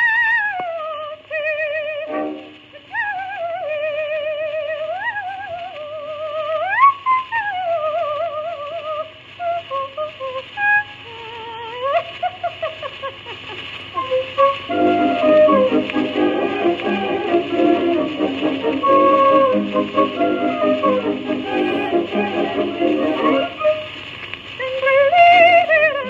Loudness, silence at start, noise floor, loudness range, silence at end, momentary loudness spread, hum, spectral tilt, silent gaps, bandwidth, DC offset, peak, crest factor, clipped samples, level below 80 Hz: -18 LUFS; 0 s; -40 dBFS; 8 LU; 0 s; 16 LU; none; -6 dB/octave; none; 7.6 kHz; under 0.1%; 0 dBFS; 18 dB; under 0.1%; -60 dBFS